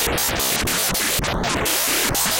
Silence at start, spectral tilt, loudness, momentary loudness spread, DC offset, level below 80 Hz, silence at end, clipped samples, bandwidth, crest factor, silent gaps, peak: 0 s; -1.5 dB/octave; -19 LUFS; 3 LU; under 0.1%; -36 dBFS; 0 s; under 0.1%; 17.5 kHz; 14 dB; none; -6 dBFS